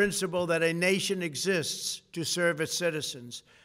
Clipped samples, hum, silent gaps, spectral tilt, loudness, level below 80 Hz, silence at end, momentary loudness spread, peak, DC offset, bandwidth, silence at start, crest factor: under 0.1%; none; none; -3 dB/octave; -29 LUFS; -66 dBFS; 0.25 s; 9 LU; -12 dBFS; under 0.1%; 16 kHz; 0 s; 16 dB